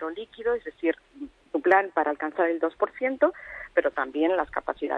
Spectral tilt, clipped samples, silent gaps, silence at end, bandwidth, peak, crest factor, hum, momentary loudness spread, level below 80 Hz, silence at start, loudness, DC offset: -6 dB/octave; under 0.1%; none; 0 s; 6 kHz; -6 dBFS; 20 dB; none; 12 LU; -60 dBFS; 0 s; -26 LUFS; under 0.1%